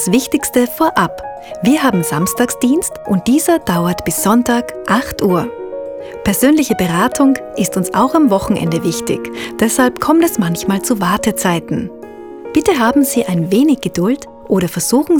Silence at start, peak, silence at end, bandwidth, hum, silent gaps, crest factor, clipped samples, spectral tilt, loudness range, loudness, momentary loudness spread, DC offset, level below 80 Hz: 0 s; 0 dBFS; 0 s; over 20 kHz; none; none; 14 dB; under 0.1%; -5 dB/octave; 1 LU; -14 LUFS; 9 LU; under 0.1%; -42 dBFS